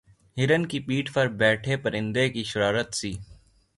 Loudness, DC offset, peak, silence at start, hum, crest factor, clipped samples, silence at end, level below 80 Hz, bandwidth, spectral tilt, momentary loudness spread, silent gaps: -25 LUFS; under 0.1%; -8 dBFS; 0.35 s; none; 18 dB; under 0.1%; 0.45 s; -54 dBFS; 11.5 kHz; -5 dB/octave; 9 LU; none